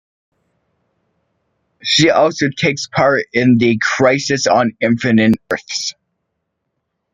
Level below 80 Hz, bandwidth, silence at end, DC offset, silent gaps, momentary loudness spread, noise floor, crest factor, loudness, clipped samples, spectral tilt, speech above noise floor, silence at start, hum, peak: -54 dBFS; 9.4 kHz; 1.25 s; under 0.1%; none; 8 LU; -73 dBFS; 16 dB; -14 LUFS; under 0.1%; -4.5 dB/octave; 59 dB; 1.85 s; none; 0 dBFS